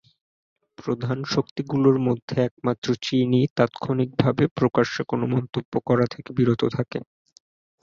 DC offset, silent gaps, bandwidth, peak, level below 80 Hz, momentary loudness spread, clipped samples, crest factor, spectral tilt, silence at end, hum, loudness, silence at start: under 0.1%; 1.51-1.56 s, 2.22-2.28 s, 2.51-2.57 s, 2.78-2.82 s, 3.50-3.56 s, 4.51-4.56 s, 5.65-5.72 s; 7.4 kHz; -4 dBFS; -58 dBFS; 8 LU; under 0.1%; 20 dB; -7 dB/octave; 0.8 s; none; -23 LUFS; 0.8 s